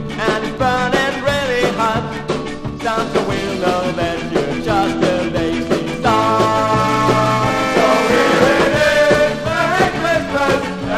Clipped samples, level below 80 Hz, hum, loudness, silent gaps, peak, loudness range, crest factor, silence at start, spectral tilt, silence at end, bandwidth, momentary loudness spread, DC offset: under 0.1%; -38 dBFS; none; -16 LUFS; none; 0 dBFS; 5 LU; 16 dB; 0 s; -5 dB/octave; 0 s; 15.5 kHz; 7 LU; under 0.1%